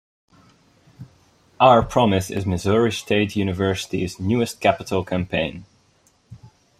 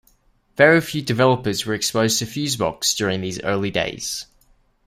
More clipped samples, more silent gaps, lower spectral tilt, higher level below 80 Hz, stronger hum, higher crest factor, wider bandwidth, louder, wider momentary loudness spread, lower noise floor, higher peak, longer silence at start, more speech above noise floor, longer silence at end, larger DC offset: neither; neither; first, -5.5 dB/octave vs -3.5 dB/octave; about the same, -48 dBFS vs -52 dBFS; neither; about the same, 20 dB vs 20 dB; about the same, 15 kHz vs 16 kHz; about the same, -20 LUFS vs -20 LUFS; about the same, 10 LU vs 10 LU; about the same, -60 dBFS vs -59 dBFS; about the same, -2 dBFS vs -2 dBFS; first, 1 s vs 0.6 s; about the same, 40 dB vs 39 dB; second, 0.35 s vs 0.65 s; neither